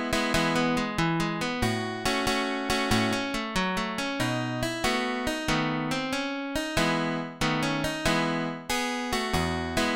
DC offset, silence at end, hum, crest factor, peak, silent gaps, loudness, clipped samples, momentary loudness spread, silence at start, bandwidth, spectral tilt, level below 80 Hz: 0.1%; 0 s; none; 18 dB; -10 dBFS; none; -27 LUFS; under 0.1%; 4 LU; 0 s; 17 kHz; -4 dB/octave; -44 dBFS